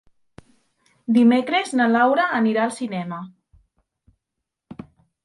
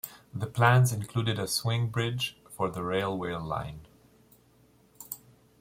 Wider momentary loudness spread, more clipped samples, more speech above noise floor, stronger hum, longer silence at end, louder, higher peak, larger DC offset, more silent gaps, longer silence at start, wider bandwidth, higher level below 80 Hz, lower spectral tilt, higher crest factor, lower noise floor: first, 25 LU vs 19 LU; neither; first, 63 dB vs 34 dB; neither; about the same, 0.5 s vs 0.45 s; first, -19 LUFS vs -29 LUFS; about the same, -6 dBFS vs -8 dBFS; neither; neither; first, 1.1 s vs 0.05 s; second, 11.5 kHz vs 16.5 kHz; second, -64 dBFS vs -58 dBFS; about the same, -5.5 dB/octave vs -5 dB/octave; second, 16 dB vs 24 dB; first, -82 dBFS vs -62 dBFS